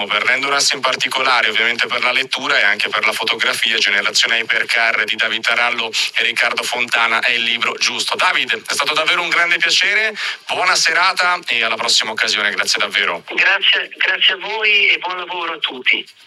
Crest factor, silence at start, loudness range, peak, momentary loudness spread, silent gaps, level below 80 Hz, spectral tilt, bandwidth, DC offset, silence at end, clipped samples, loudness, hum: 16 dB; 0 s; 1 LU; -2 dBFS; 5 LU; none; -78 dBFS; 0.5 dB/octave; 14.5 kHz; under 0.1%; 0.15 s; under 0.1%; -14 LUFS; none